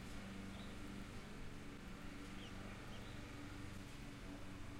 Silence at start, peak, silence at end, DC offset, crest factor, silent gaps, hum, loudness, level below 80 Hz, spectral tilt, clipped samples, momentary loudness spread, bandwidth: 0 s; -36 dBFS; 0 s; under 0.1%; 14 dB; none; none; -53 LUFS; -58 dBFS; -5 dB/octave; under 0.1%; 2 LU; 16 kHz